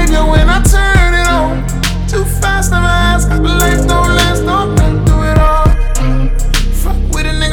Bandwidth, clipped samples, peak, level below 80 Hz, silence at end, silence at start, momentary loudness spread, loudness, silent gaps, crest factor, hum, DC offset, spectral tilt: 18.5 kHz; under 0.1%; 0 dBFS; -12 dBFS; 0 s; 0 s; 6 LU; -12 LUFS; none; 10 dB; none; under 0.1%; -5 dB/octave